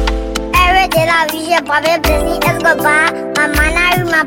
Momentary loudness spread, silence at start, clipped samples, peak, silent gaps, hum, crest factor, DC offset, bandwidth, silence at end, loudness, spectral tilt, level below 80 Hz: 5 LU; 0 s; under 0.1%; 0 dBFS; none; none; 12 dB; under 0.1%; 17 kHz; 0 s; -12 LUFS; -4 dB/octave; -22 dBFS